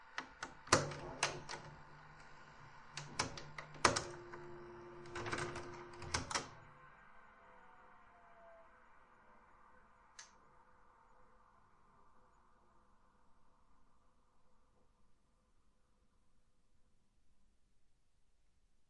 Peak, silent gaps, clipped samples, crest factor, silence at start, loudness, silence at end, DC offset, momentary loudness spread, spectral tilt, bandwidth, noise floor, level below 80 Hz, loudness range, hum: -12 dBFS; none; under 0.1%; 36 dB; 0 s; -41 LUFS; 0.05 s; under 0.1%; 28 LU; -2.5 dB/octave; 10.5 kHz; -72 dBFS; -68 dBFS; 23 LU; none